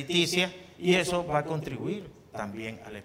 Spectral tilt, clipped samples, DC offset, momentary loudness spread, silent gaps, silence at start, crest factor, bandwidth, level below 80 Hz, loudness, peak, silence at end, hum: -4.5 dB/octave; under 0.1%; under 0.1%; 14 LU; none; 0 s; 18 dB; 16 kHz; -60 dBFS; -29 LUFS; -12 dBFS; 0 s; none